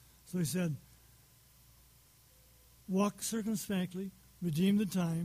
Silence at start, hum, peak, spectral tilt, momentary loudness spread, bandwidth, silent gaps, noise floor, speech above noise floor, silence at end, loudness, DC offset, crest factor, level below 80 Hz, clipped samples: 0.25 s; none; -20 dBFS; -5.5 dB/octave; 13 LU; 15.5 kHz; none; -63 dBFS; 30 dB; 0 s; -35 LUFS; under 0.1%; 16 dB; -66 dBFS; under 0.1%